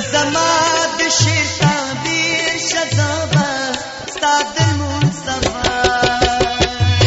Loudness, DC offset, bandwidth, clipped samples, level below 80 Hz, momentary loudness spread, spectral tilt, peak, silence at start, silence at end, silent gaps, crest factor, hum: -15 LUFS; under 0.1%; 8.2 kHz; under 0.1%; -34 dBFS; 6 LU; -3.5 dB/octave; -2 dBFS; 0 s; 0 s; none; 14 dB; none